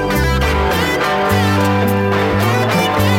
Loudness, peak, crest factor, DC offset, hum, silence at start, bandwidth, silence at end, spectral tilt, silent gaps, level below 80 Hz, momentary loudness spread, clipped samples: -14 LUFS; -2 dBFS; 12 dB; under 0.1%; none; 0 s; 16.5 kHz; 0 s; -5.5 dB/octave; none; -26 dBFS; 1 LU; under 0.1%